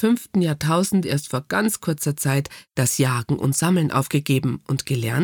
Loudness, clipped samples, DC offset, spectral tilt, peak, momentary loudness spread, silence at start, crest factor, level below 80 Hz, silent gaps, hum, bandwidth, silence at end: -22 LUFS; under 0.1%; under 0.1%; -5 dB/octave; -6 dBFS; 5 LU; 0 s; 14 dB; -56 dBFS; none; none; over 20 kHz; 0 s